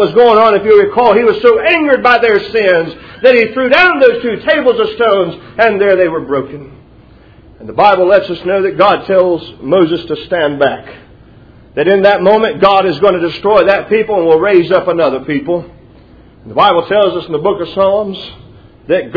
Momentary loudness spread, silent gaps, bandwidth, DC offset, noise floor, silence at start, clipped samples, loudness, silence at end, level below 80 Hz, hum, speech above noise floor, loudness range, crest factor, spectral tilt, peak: 10 LU; none; 5.4 kHz; under 0.1%; -40 dBFS; 0 s; 0.8%; -10 LUFS; 0 s; -44 dBFS; none; 30 dB; 5 LU; 10 dB; -7 dB/octave; 0 dBFS